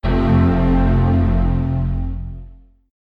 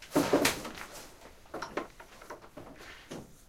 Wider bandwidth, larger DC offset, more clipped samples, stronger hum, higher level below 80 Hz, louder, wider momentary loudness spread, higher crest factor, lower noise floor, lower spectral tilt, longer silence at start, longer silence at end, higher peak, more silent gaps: second, 5 kHz vs 16 kHz; neither; neither; neither; first, -22 dBFS vs -58 dBFS; first, -17 LUFS vs -32 LUFS; second, 14 LU vs 23 LU; second, 12 dB vs 26 dB; second, -40 dBFS vs -53 dBFS; first, -10.5 dB/octave vs -3.5 dB/octave; about the same, 0.05 s vs 0 s; first, 0.55 s vs 0.1 s; first, -6 dBFS vs -10 dBFS; neither